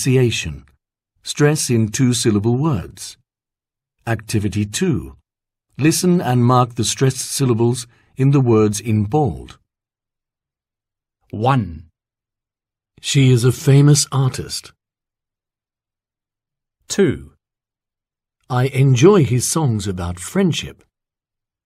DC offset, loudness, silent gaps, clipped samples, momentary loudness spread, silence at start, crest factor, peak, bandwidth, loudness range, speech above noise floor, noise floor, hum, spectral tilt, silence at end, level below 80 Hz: under 0.1%; -17 LUFS; none; under 0.1%; 15 LU; 0 s; 18 dB; 0 dBFS; 15.5 kHz; 9 LU; 73 dB; -89 dBFS; none; -5.5 dB/octave; 0.95 s; -48 dBFS